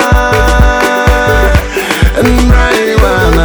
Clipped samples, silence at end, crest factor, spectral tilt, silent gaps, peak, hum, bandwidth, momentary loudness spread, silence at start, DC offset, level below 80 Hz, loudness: 2%; 0 s; 8 dB; -5.5 dB/octave; none; 0 dBFS; none; over 20 kHz; 3 LU; 0 s; under 0.1%; -12 dBFS; -9 LUFS